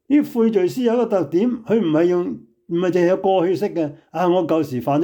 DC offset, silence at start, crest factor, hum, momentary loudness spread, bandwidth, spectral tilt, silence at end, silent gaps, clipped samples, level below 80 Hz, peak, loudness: under 0.1%; 0.1 s; 12 dB; none; 7 LU; 19.5 kHz; -7.5 dB/octave; 0 s; none; under 0.1%; -66 dBFS; -6 dBFS; -19 LUFS